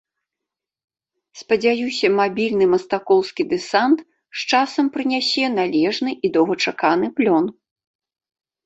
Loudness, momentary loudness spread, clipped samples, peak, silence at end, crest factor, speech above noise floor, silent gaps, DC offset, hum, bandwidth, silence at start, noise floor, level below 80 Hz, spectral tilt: -19 LUFS; 4 LU; under 0.1%; -2 dBFS; 1.15 s; 18 dB; 67 dB; none; under 0.1%; none; 8.2 kHz; 1.35 s; -85 dBFS; -64 dBFS; -4.5 dB/octave